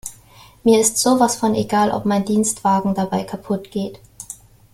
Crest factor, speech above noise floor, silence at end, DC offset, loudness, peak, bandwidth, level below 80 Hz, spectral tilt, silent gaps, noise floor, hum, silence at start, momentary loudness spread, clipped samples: 16 dB; 29 dB; 0.4 s; under 0.1%; -18 LUFS; -2 dBFS; 16 kHz; -52 dBFS; -4.5 dB/octave; none; -47 dBFS; none; 0.05 s; 20 LU; under 0.1%